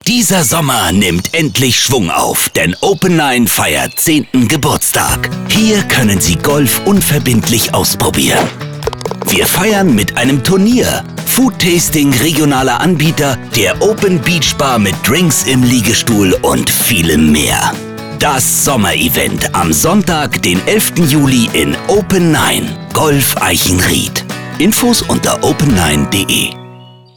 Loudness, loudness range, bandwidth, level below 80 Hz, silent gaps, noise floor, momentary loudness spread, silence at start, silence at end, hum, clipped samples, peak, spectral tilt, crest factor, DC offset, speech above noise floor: -10 LUFS; 1 LU; over 20 kHz; -32 dBFS; none; -35 dBFS; 4 LU; 0.05 s; 0.3 s; none; under 0.1%; -2 dBFS; -3.5 dB/octave; 10 dB; under 0.1%; 24 dB